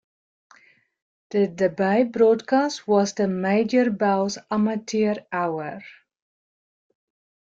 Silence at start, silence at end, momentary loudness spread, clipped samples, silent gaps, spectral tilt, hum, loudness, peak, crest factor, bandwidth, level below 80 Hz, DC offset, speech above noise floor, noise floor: 1.3 s; 1.55 s; 8 LU; under 0.1%; none; -6 dB/octave; none; -22 LUFS; -6 dBFS; 16 dB; 7.6 kHz; -68 dBFS; under 0.1%; 36 dB; -57 dBFS